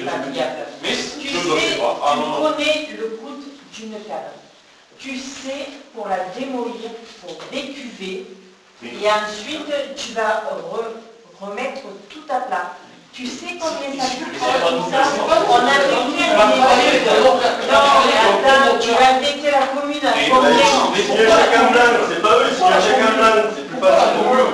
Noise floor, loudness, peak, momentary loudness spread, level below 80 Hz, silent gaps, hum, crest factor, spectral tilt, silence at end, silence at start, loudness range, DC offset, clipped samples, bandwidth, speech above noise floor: -48 dBFS; -16 LUFS; -4 dBFS; 19 LU; -54 dBFS; none; none; 12 dB; -2.5 dB/octave; 0 s; 0 s; 15 LU; under 0.1%; under 0.1%; 11 kHz; 32 dB